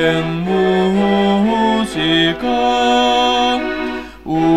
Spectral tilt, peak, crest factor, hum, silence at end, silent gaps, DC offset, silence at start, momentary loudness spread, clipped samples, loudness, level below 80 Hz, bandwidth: -5.5 dB/octave; -2 dBFS; 12 dB; none; 0 s; none; 0.5%; 0 s; 8 LU; under 0.1%; -15 LUFS; -42 dBFS; 13.5 kHz